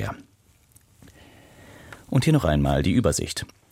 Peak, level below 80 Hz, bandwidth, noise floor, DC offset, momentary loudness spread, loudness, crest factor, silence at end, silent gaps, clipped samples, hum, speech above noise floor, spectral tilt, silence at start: -6 dBFS; -38 dBFS; 16 kHz; -59 dBFS; under 0.1%; 22 LU; -23 LUFS; 18 dB; 0.25 s; none; under 0.1%; none; 38 dB; -5.5 dB/octave; 0 s